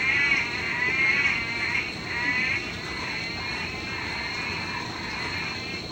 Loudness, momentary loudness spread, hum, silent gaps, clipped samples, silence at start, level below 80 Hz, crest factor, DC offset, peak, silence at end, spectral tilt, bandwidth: -26 LUFS; 10 LU; none; none; under 0.1%; 0 s; -50 dBFS; 18 dB; under 0.1%; -10 dBFS; 0 s; -3 dB/octave; 16 kHz